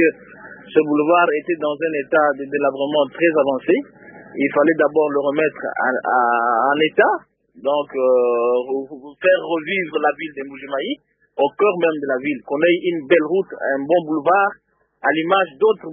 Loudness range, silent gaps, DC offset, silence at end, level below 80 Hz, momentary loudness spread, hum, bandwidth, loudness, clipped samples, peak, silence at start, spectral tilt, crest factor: 3 LU; none; under 0.1%; 0 s; -68 dBFS; 10 LU; none; 3.7 kHz; -18 LUFS; under 0.1%; -2 dBFS; 0 s; -10 dB/octave; 18 dB